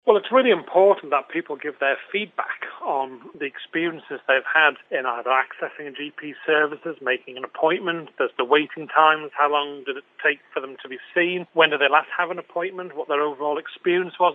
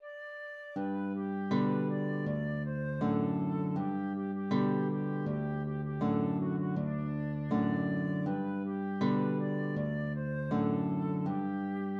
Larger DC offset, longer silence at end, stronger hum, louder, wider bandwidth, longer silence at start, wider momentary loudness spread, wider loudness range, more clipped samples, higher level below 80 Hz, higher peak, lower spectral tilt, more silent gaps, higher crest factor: neither; about the same, 0 s vs 0 s; neither; first, -22 LUFS vs -33 LUFS; second, 4 kHz vs 6.2 kHz; about the same, 0.05 s vs 0 s; first, 14 LU vs 5 LU; first, 3 LU vs 0 LU; neither; second, -88 dBFS vs -64 dBFS; first, 0 dBFS vs -18 dBFS; second, -6.5 dB/octave vs -10 dB/octave; neither; first, 22 dB vs 14 dB